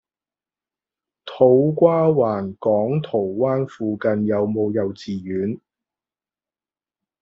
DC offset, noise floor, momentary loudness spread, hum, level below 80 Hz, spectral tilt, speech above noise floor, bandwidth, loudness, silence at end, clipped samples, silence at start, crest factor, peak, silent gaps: under 0.1%; under -90 dBFS; 12 LU; none; -62 dBFS; -8 dB/octave; over 71 dB; 7.2 kHz; -20 LUFS; 1.65 s; under 0.1%; 1.25 s; 20 dB; -2 dBFS; none